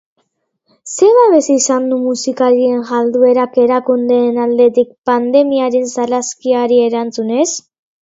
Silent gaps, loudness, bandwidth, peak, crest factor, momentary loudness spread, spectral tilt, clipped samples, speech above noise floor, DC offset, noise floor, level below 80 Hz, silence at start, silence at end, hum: 4.98-5.02 s; -13 LUFS; 8 kHz; 0 dBFS; 12 dB; 7 LU; -3.5 dB/octave; under 0.1%; 54 dB; under 0.1%; -66 dBFS; -64 dBFS; 0.85 s; 0.45 s; none